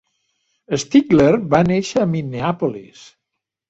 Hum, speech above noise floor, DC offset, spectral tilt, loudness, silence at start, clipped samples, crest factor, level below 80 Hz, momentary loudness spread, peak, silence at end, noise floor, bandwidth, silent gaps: none; 63 dB; under 0.1%; -6.5 dB/octave; -17 LUFS; 0.7 s; under 0.1%; 16 dB; -50 dBFS; 11 LU; -2 dBFS; 0.85 s; -80 dBFS; 8 kHz; none